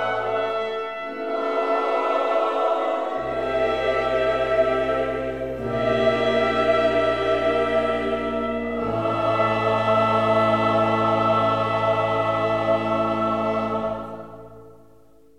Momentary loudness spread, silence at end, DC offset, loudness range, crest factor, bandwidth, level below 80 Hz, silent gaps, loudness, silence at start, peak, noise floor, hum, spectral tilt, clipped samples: 7 LU; 0.65 s; 0.3%; 3 LU; 14 dB; 9.6 kHz; -48 dBFS; none; -22 LUFS; 0 s; -8 dBFS; -54 dBFS; none; -6.5 dB/octave; under 0.1%